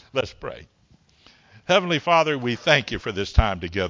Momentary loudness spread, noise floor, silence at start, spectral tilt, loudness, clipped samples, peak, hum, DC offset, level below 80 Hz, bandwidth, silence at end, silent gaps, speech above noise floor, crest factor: 17 LU; -56 dBFS; 0.15 s; -5 dB/octave; -22 LUFS; under 0.1%; 0 dBFS; none; under 0.1%; -32 dBFS; 7.6 kHz; 0 s; none; 34 dB; 22 dB